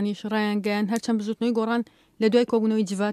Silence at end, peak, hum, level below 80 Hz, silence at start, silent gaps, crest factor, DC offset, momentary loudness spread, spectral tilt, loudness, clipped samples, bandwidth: 0 s; -8 dBFS; none; -70 dBFS; 0 s; none; 16 dB; under 0.1%; 5 LU; -6 dB/octave; -24 LUFS; under 0.1%; 13.5 kHz